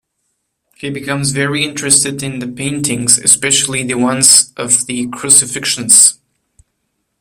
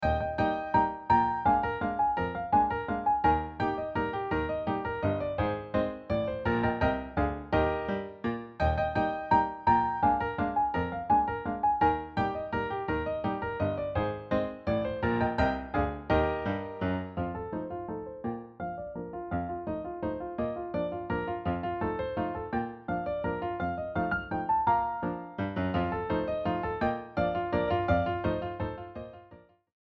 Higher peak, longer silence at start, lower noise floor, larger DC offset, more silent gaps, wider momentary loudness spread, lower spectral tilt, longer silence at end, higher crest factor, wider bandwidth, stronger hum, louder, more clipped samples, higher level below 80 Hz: first, 0 dBFS vs -12 dBFS; first, 0.8 s vs 0 s; first, -69 dBFS vs -56 dBFS; neither; neither; first, 14 LU vs 9 LU; second, -1.5 dB/octave vs -9 dB/octave; first, 1.05 s vs 0.45 s; about the same, 14 dB vs 18 dB; first, over 20 kHz vs 6.8 kHz; neither; first, -10 LUFS vs -30 LUFS; first, 0.5% vs under 0.1%; second, -52 dBFS vs -46 dBFS